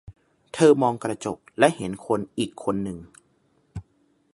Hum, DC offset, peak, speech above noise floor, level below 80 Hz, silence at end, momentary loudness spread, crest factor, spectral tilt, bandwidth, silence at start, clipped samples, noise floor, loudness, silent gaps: none; under 0.1%; -2 dBFS; 42 dB; -56 dBFS; 0.55 s; 23 LU; 24 dB; -5.5 dB/octave; 11.5 kHz; 0.1 s; under 0.1%; -65 dBFS; -23 LUFS; none